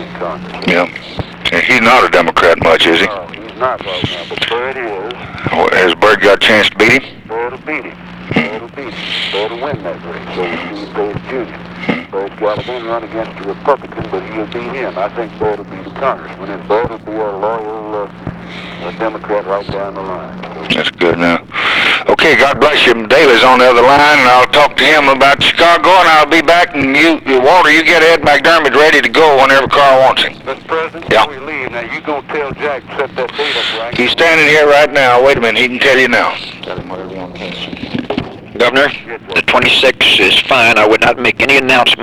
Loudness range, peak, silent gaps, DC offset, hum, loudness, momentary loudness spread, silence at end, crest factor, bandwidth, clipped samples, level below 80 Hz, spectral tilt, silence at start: 12 LU; 0 dBFS; none; under 0.1%; none; -10 LUFS; 17 LU; 0 s; 10 dB; 19.5 kHz; under 0.1%; -42 dBFS; -4 dB/octave; 0 s